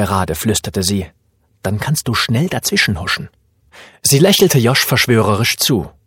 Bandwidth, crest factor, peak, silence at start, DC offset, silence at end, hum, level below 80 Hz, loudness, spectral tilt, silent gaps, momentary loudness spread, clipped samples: 17 kHz; 16 dB; 0 dBFS; 0 s; under 0.1%; 0.2 s; none; -42 dBFS; -14 LUFS; -4 dB/octave; none; 11 LU; under 0.1%